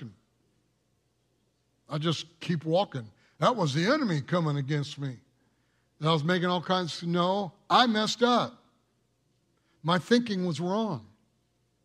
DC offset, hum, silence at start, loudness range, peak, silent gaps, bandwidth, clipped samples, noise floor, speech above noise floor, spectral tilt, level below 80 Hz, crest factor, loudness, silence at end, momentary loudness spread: under 0.1%; none; 0 s; 5 LU; -8 dBFS; none; 12 kHz; under 0.1%; -73 dBFS; 45 dB; -5.5 dB/octave; -74 dBFS; 22 dB; -28 LUFS; 0.8 s; 11 LU